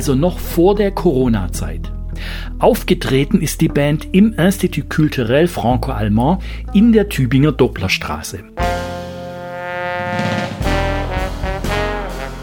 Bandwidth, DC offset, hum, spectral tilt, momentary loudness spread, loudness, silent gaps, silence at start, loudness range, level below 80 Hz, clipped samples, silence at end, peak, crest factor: 19 kHz; under 0.1%; none; -6 dB/octave; 13 LU; -17 LUFS; none; 0 s; 6 LU; -26 dBFS; under 0.1%; 0 s; 0 dBFS; 16 dB